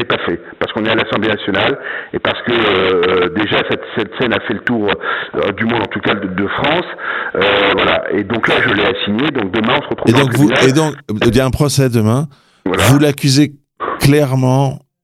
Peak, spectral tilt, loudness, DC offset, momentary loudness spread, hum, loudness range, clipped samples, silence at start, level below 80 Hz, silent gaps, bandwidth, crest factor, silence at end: 0 dBFS; -5.5 dB/octave; -14 LUFS; under 0.1%; 7 LU; none; 3 LU; under 0.1%; 0 s; -42 dBFS; none; 16 kHz; 14 dB; 0.25 s